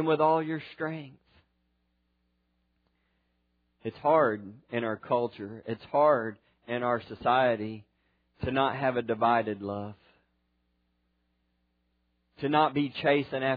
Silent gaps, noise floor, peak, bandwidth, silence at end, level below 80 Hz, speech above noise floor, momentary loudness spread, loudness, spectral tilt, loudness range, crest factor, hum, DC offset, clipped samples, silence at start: none; -75 dBFS; -10 dBFS; 5 kHz; 0 s; -64 dBFS; 47 dB; 14 LU; -28 LUFS; -9 dB/octave; 8 LU; 20 dB; 60 Hz at -65 dBFS; under 0.1%; under 0.1%; 0 s